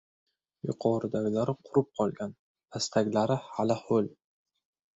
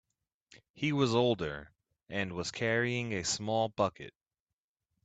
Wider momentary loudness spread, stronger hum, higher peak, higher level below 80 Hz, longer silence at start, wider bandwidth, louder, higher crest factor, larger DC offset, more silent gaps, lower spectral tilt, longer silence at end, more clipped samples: about the same, 11 LU vs 11 LU; neither; about the same, -12 dBFS vs -14 dBFS; about the same, -68 dBFS vs -64 dBFS; about the same, 0.65 s vs 0.55 s; second, 8.2 kHz vs 9.2 kHz; about the same, -30 LUFS vs -32 LUFS; about the same, 20 dB vs 20 dB; neither; first, 2.39-2.55 s vs 0.70-0.74 s; first, -6 dB/octave vs -4.5 dB/octave; about the same, 0.85 s vs 0.95 s; neither